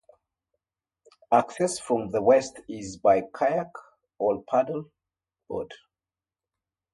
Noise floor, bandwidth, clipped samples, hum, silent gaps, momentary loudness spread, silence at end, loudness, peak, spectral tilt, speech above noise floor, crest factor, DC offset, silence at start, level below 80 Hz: under -90 dBFS; 11.5 kHz; under 0.1%; none; none; 15 LU; 1.2 s; -25 LUFS; -6 dBFS; -5 dB/octave; over 65 dB; 20 dB; under 0.1%; 1.3 s; -64 dBFS